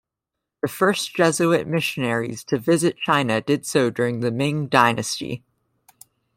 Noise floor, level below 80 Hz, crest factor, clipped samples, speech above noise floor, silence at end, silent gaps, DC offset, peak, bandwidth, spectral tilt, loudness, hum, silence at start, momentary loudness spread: -84 dBFS; -62 dBFS; 20 dB; under 0.1%; 63 dB; 1 s; none; under 0.1%; -2 dBFS; 16.5 kHz; -4.5 dB/octave; -21 LUFS; none; 0.65 s; 9 LU